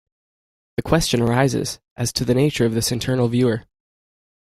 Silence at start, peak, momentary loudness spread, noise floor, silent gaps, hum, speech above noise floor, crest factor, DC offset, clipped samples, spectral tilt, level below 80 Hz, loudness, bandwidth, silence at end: 0.8 s; -2 dBFS; 11 LU; under -90 dBFS; 1.91-1.96 s; none; over 71 dB; 20 dB; under 0.1%; under 0.1%; -5 dB/octave; -42 dBFS; -20 LUFS; 16 kHz; 1 s